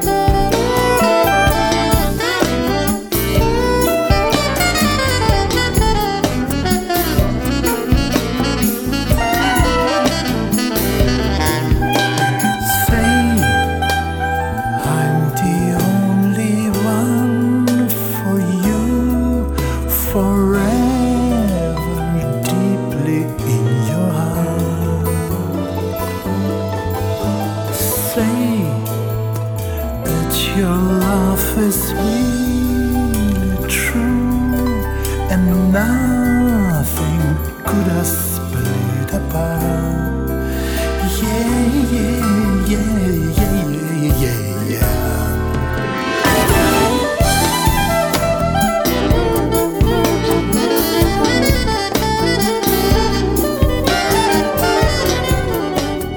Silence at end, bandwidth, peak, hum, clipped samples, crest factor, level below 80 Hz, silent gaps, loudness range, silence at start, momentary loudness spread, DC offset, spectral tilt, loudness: 0 s; over 20 kHz; 0 dBFS; none; under 0.1%; 14 dB; -24 dBFS; none; 3 LU; 0 s; 5 LU; under 0.1%; -5 dB/octave; -16 LUFS